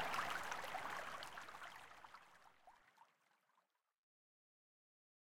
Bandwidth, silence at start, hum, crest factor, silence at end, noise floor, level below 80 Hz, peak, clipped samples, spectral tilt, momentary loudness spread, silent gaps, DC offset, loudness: 16.5 kHz; 0 s; none; 22 dB; 1.35 s; -84 dBFS; -80 dBFS; -30 dBFS; under 0.1%; -1.5 dB/octave; 24 LU; none; under 0.1%; -48 LUFS